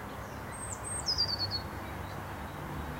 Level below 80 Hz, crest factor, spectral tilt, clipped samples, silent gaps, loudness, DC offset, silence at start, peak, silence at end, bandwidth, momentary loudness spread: -48 dBFS; 16 dB; -3 dB/octave; under 0.1%; none; -35 LUFS; under 0.1%; 0 s; -20 dBFS; 0 s; 16 kHz; 12 LU